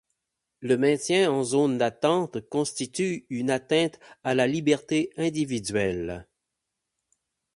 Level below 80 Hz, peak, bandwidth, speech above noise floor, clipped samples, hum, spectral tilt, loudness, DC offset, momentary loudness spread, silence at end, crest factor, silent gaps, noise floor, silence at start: -58 dBFS; -8 dBFS; 11.5 kHz; 58 dB; under 0.1%; none; -5 dB/octave; -26 LUFS; under 0.1%; 7 LU; 1.35 s; 18 dB; none; -83 dBFS; 0.6 s